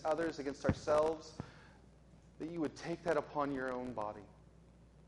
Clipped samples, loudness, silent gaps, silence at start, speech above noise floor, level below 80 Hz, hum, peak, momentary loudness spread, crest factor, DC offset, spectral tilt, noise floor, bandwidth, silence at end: under 0.1%; -38 LUFS; none; 0 s; 24 dB; -60 dBFS; none; -20 dBFS; 17 LU; 20 dB; under 0.1%; -6.5 dB/octave; -62 dBFS; 11.5 kHz; 0.05 s